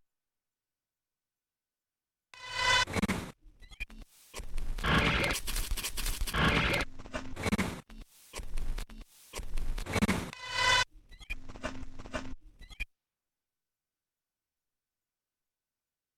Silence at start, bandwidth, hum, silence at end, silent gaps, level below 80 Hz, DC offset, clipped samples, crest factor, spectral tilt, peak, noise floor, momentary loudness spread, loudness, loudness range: 2.35 s; 17.5 kHz; none; 3.35 s; none; -42 dBFS; under 0.1%; under 0.1%; 24 dB; -3.5 dB/octave; -10 dBFS; under -90 dBFS; 19 LU; -32 LUFS; 15 LU